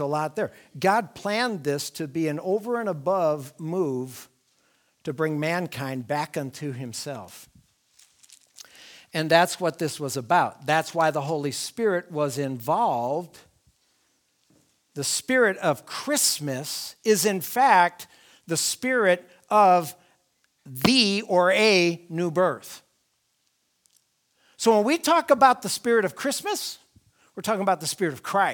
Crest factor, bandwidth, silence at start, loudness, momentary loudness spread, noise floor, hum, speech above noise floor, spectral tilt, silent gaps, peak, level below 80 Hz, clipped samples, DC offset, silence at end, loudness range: 22 dB; over 20 kHz; 0 s; -24 LUFS; 14 LU; -72 dBFS; none; 48 dB; -3.5 dB/octave; none; -2 dBFS; -68 dBFS; under 0.1%; under 0.1%; 0 s; 8 LU